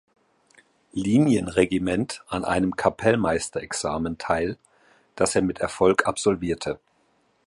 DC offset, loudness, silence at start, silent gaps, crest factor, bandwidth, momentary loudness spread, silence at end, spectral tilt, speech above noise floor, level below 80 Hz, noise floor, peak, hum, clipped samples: under 0.1%; -24 LUFS; 0.95 s; none; 20 dB; 11.5 kHz; 9 LU; 0.7 s; -5 dB/octave; 42 dB; -48 dBFS; -65 dBFS; -4 dBFS; none; under 0.1%